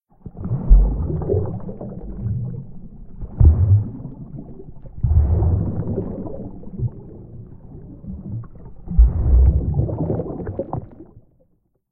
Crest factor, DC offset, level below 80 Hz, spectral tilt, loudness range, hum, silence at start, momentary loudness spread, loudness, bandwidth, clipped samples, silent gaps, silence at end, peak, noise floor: 18 dB; under 0.1%; -22 dBFS; -15.5 dB/octave; 5 LU; none; 0.25 s; 24 LU; -21 LUFS; 1.8 kHz; under 0.1%; none; 0.7 s; -2 dBFS; -62 dBFS